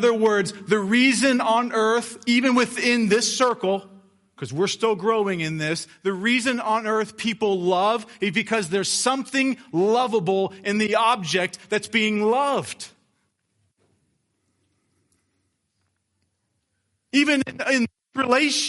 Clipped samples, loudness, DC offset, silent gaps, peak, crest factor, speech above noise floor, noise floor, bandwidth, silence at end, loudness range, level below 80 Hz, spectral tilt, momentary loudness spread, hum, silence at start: under 0.1%; -22 LUFS; under 0.1%; none; -6 dBFS; 18 dB; 52 dB; -74 dBFS; 11.5 kHz; 0 s; 7 LU; -70 dBFS; -3.5 dB/octave; 7 LU; none; 0 s